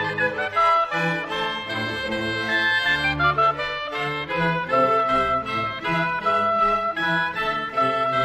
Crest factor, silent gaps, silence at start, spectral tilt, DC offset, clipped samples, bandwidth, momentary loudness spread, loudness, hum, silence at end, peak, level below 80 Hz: 14 dB; none; 0 s; -5 dB/octave; under 0.1%; under 0.1%; 14 kHz; 7 LU; -22 LUFS; none; 0 s; -8 dBFS; -48 dBFS